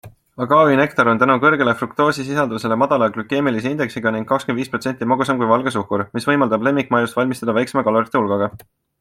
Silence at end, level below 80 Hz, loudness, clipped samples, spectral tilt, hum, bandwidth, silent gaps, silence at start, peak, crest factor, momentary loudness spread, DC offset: 0.45 s; -58 dBFS; -18 LUFS; under 0.1%; -6 dB/octave; none; 15.5 kHz; none; 0.05 s; -2 dBFS; 16 dB; 8 LU; under 0.1%